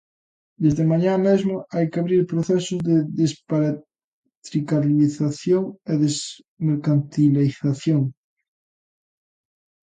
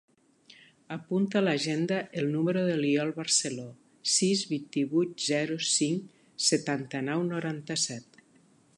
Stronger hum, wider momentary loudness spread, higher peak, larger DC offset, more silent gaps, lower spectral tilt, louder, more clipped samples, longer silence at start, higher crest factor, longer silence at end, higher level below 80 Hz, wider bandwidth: neither; about the same, 7 LU vs 9 LU; first, -6 dBFS vs -12 dBFS; neither; first, 4.04-4.23 s, 4.37-4.42 s, 6.48-6.57 s vs none; first, -7 dB/octave vs -3.5 dB/octave; first, -21 LUFS vs -28 LUFS; neither; second, 0.6 s vs 0.9 s; about the same, 16 dB vs 18 dB; first, 1.75 s vs 0.75 s; first, -60 dBFS vs -78 dBFS; second, 9.4 kHz vs 11.5 kHz